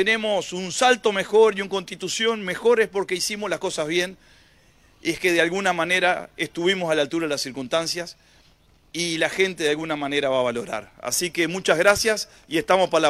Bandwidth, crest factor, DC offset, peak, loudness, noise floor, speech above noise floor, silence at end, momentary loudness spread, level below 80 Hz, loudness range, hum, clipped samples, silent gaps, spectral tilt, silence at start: 15 kHz; 22 dB; under 0.1%; -2 dBFS; -22 LUFS; -57 dBFS; 34 dB; 0 s; 10 LU; -58 dBFS; 4 LU; none; under 0.1%; none; -3 dB/octave; 0 s